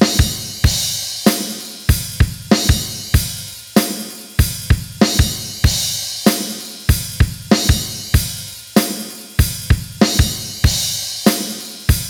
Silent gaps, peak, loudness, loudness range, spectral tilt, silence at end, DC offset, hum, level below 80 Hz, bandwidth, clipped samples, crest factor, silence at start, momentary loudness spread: none; 0 dBFS; -17 LUFS; 1 LU; -4 dB/octave; 0 s; under 0.1%; none; -24 dBFS; 20 kHz; under 0.1%; 16 dB; 0 s; 8 LU